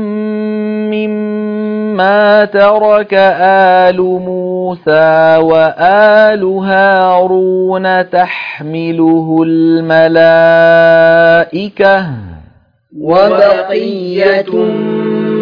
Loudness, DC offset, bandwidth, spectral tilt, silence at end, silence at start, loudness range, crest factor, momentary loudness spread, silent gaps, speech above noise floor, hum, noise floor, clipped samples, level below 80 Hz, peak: -9 LUFS; under 0.1%; 5.4 kHz; -8 dB/octave; 0 s; 0 s; 3 LU; 8 dB; 10 LU; none; 36 dB; none; -44 dBFS; 0.4%; -50 dBFS; 0 dBFS